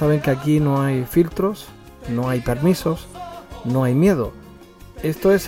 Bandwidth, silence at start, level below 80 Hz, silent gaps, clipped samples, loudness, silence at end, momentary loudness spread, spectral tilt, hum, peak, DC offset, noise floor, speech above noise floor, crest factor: 17 kHz; 0 s; -42 dBFS; none; under 0.1%; -20 LUFS; 0 s; 17 LU; -7.5 dB/octave; none; -4 dBFS; under 0.1%; -42 dBFS; 24 dB; 16 dB